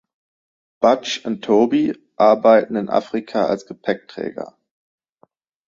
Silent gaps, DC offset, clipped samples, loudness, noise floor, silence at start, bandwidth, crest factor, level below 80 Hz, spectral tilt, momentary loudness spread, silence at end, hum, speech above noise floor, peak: none; under 0.1%; under 0.1%; -18 LUFS; -59 dBFS; 0.8 s; 7.6 kHz; 18 dB; -64 dBFS; -5.5 dB/octave; 14 LU; 1.2 s; none; 42 dB; -2 dBFS